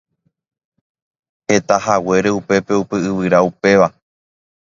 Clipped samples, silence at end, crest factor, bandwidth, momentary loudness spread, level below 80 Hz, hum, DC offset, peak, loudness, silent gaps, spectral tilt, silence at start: under 0.1%; 0.85 s; 18 dB; 7.6 kHz; 5 LU; -52 dBFS; none; under 0.1%; 0 dBFS; -15 LUFS; none; -5.5 dB/octave; 1.5 s